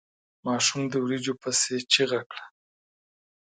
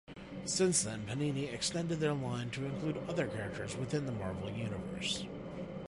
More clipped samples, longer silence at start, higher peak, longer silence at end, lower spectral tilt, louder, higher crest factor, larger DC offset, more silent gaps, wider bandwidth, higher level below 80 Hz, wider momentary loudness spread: neither; first, 0.45 s vs 0.1 s; first, -6 dBFS vs -18 dBFS; first, 1.1 s vs 0.05 s; second, -2.5 dB/octave vs -4.5 dB/octave; first, -25 LUFS vs -36 LUFS; about the same, 24 dB vs 20 dB; neither; first, 2.26-2.30 s vs none; second, 9.6 kHz vs 11.5 kHz; second, -74 dBFS vs -60 dBFS; first, 13 LU vs 8 LU